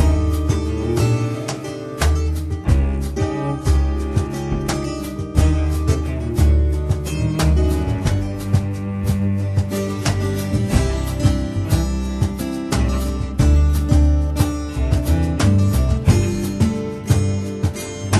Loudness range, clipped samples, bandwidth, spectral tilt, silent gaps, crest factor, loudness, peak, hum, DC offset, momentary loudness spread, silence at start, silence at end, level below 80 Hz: 3 LU; under 0.1%; 13 kHz; -6.5 dB/octave; none; 18 dB; -20 LUFS; 0 dBFS; none; under 0.1%; 7 LU; 0 s; 0 s; -22 dBFS